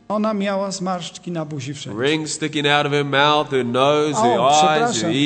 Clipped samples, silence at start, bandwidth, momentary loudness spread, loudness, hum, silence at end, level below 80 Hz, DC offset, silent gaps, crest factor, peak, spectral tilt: under 0.1%; 0.1 s; 9.2 kHz; 13 LU; -18 LUFS; none; 0 s; -62 dBFS; under 0.1%; none; 18 dB; 0 dBFS; -4 dB/octave